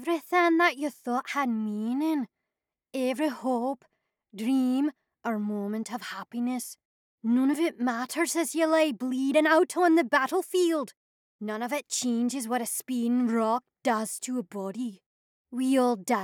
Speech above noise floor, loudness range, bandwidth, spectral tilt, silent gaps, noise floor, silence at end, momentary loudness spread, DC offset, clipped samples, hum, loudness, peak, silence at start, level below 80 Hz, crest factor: 61 dB; 6 LU; 19 kHz; -3.5 dB/octave; 6.85-7.18 s, 10.97-11.39 s, 15.06-15.45 s; -88 dBFS; 0 s; 13 LU; under 0.1%; under 0.1%; none; -27 LUFS; -10 dBFS; 0 s; -88 dBFS; 18 dB